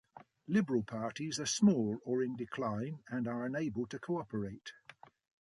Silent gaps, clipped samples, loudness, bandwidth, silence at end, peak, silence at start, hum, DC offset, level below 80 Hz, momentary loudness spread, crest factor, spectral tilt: none; under 0.1%; -36 LUFS; 11.5 kHz; 0.7 s; -18 dBFS; 0.15 s; none; under 0.1%; -70 dBFS; 13 LU; 18 dB; -5 dB/octave